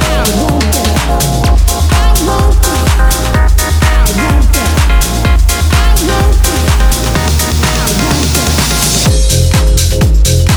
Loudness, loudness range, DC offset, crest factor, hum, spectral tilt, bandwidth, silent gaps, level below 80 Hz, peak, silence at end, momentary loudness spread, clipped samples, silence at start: -10 LUFS; 0 LU; under 0.1%; 8 dB; none; -4 dB/octave; over 20 kHz; none; -10 dBFS; 0 dBFS; 0 s; 2 LU; under 0.1%; 0 s